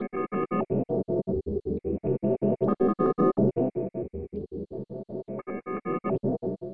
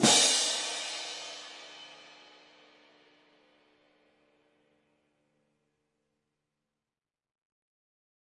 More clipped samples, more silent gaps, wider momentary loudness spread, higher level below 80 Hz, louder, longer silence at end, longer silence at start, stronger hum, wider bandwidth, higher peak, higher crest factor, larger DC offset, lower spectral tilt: neither; neither; second, 13 LU vs 27 LU; first, -50 dBFS vs -84 dBFS; about the same, -29 LUFS vs -27 LUFS; second, 0 s vs 6.35 s; about the same, 0 s vs 0 s; neither; second, 3.4 kHz vs 11.5 kHz; about the same, -10 dBFS vs -10 dBFS; second, 18 dB vs 26 dB; neither; first, -12.5 dB/octave vs -1 dB/octave